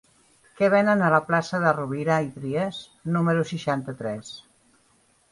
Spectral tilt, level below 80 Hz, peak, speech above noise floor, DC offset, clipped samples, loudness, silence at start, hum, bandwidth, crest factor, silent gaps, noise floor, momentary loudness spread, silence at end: -6.5 dB/octave; -64 dBFS; -6 dBFS; 39 dB; under 0.1%; under 0.1%; -24 LUFS; 0.6 s; none; 11.5 kHz; 20 dB; none; -63 dBFS; 13 LU; 0.9 s